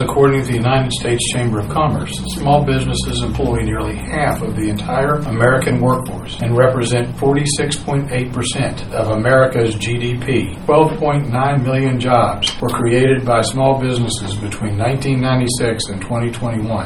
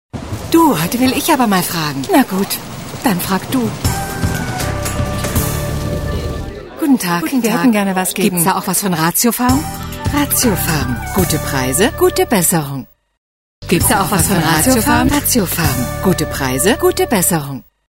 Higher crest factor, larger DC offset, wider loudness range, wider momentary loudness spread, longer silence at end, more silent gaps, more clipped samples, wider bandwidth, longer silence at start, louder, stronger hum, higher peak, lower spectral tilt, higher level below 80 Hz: about the same, 16 dB vs 16 dB; neither; second, 2 LU vs 5 LU; about the same, 7 LU vs 8 LU; second, 0 s vs 0.4 s; second, none vs 13.17-13.62 s; neither; second, 14.5 kHz vs 16.5 kHz; second, 0 s vs 0.15 s; about the same, -16 LUFS vs -15 LUFS; neither; about the same, 0 dBFS vs 0 dBFS; first, -5.5 dB/octave vs -4 dB/octave; about the same, -32 dBFS vs -30 dBFS